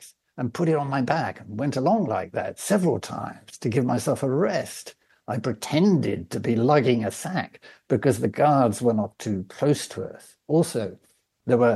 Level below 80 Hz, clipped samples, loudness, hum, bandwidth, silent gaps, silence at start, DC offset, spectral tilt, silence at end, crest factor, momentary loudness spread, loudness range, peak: -64 dBFS; under 0.1%; -24 LUFS; none; 12.5 kHz; none; 0 s; under 0.1%; -6.5 dB/octave; 0 s; 18 dB; 14 LU; 3 LU; -6 dBFS